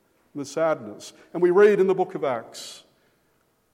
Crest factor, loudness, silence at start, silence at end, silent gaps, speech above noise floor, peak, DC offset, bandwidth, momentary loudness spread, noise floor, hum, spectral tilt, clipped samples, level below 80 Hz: 20 dB; -22 LUFS; 0.35 s; 0.95 s; none; 44 dB; -4 dBFS; under 0.1%; 13 kHz; 23 LU; -67 dBFS; none; -5.5 dB/octave; under 0.1%; -78 dBFS